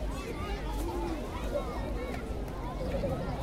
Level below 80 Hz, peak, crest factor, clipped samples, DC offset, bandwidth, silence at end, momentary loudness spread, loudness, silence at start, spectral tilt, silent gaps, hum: -38 dBFS; -20 dBFS; 14 dB; under 0.1%; under 0.1%; 16 kHz; 0 s; 4 LU; -36 LUFS; 0 s; -6.5 dB/octave; none; none